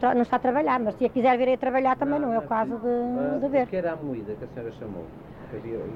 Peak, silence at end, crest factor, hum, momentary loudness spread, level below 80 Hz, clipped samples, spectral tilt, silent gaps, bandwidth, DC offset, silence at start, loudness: -10 dBFS; 0 s; 14 dB; none; 15 LU; -54 dBFS; under 0.1%; -8.5 dB/octave; none; 6 kHz; under 0.1%; 0 s; -25 LUFS